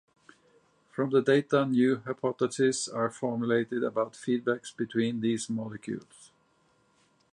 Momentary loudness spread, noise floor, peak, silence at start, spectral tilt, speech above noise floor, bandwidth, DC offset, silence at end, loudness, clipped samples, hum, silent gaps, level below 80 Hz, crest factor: 10 LU; -68 dBFS; -12 dBFS; 0.95 s; -5.5 dB/octave; 40 dB; 11 kHz; under 0.1%; 1.3 s; -29 LUFS; under 0.1%; none; none; -76 dBFS; 18 dB